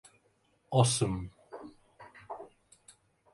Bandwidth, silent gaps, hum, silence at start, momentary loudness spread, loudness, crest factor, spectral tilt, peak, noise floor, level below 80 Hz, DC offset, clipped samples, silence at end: 11.5 kHz; none; none; 0.7 s; 27 LU; -29 LUFS; 24 dB; -5 dB/octave; -12 dBFS; -71 dBFS; -58 dBFS; under 0.1%; under 0.1%; 0.9 s